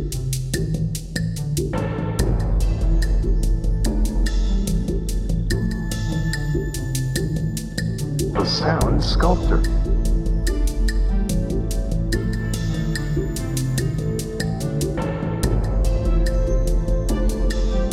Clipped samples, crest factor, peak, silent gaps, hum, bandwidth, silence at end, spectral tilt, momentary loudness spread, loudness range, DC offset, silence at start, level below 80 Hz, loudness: under 0.1%; 16 dB; -4 dBFS; none; none; 14.5 kHz; 0 s; -6 dB/octave; 5 LU; 3 LU; under 0.1%; 0 s; -22 dBFS; -23 LUFS